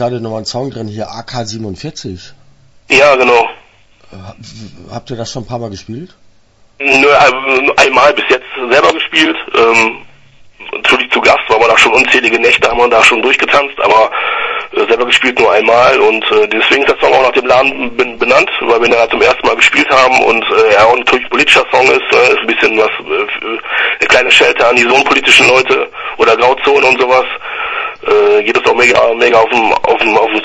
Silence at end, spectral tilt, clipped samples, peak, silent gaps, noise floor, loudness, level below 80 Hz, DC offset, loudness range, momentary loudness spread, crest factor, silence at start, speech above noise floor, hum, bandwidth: 0 s; -3 dB/octave; 0.6%; 0 dBFS; none; -46 dBFS; -8 LUFS; -44 dBFS; under 0.1%; 6 LU; 15 LU; 10 dB; 0 s; 36 dB; none; 11 kHz